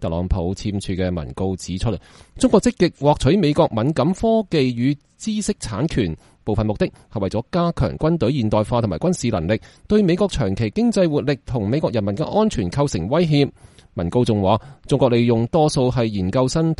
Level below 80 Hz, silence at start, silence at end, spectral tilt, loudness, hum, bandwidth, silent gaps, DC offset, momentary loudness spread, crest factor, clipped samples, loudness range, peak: -36 dBFS; 0 s; 0.05 s; -6.5 dB/octave; -20 LUFS; none; 11.5 kHz; none; under 0.1%; 8 LU; 18 dB; under 0.1%; 3 LU; -2 dBFS